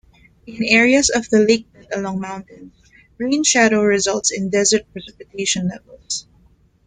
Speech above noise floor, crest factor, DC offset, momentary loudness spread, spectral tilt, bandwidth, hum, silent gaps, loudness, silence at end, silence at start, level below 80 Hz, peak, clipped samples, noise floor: 37 dB; 18 dB; under 0.1%; 16 LU; -3 dB/octave; 9.6 kHz; none; none; -17 LUFS; 0.65 s; 0.45 s; -50 dBFS; -2 dBFS; under 0.1%; -54 dBFS